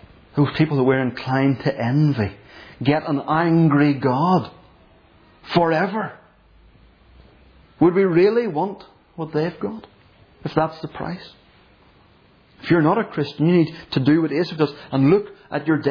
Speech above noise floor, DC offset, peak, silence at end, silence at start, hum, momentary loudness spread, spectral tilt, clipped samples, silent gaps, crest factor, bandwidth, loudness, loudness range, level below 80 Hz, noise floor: 35 dB; under 0.1%; -4 dBFS; 0 s; 0.35 s; none; 14 LU; -9 dB/octave; under 0.1%; none; 18 dB; 5.4 kHz; -20 LUFS; 7 LU; -54 dBFS; -54 dBFS